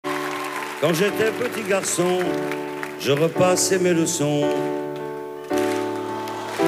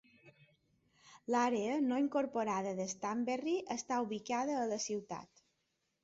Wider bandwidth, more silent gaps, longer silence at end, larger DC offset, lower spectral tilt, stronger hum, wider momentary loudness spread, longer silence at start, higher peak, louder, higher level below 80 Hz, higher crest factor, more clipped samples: first, 16 kHz vs 8 kHz; neither; second, 0 s vs 0.8 s; neither; about the same, -4 dB/octave vs -4 dB/octave; neither; first, 10 LU vs 6 LU; second, 0.05 s vs 0.25 s; first, -6 dBFS vs -20 dBFS; first, -22 LUFS vs -36 LUFS; first, -66 dBFS vs -80 dBFS; about the same, 16 dB vs 16 dB; neither